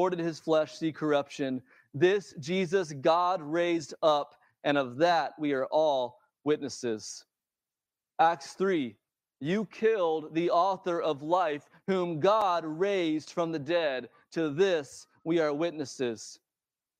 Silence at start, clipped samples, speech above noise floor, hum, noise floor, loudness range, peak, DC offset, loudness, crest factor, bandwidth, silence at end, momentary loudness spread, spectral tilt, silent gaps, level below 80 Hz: 0 s; under 0.1%; over 61 dB; none; under -90 dBFS; 3 LU; -12 dBFS; under 0.1%; -29 LUFS; 18 dB; 10.5 kHz; 0.65 s; 11 LU; -5.5 dB/octave; none; -80 dBFS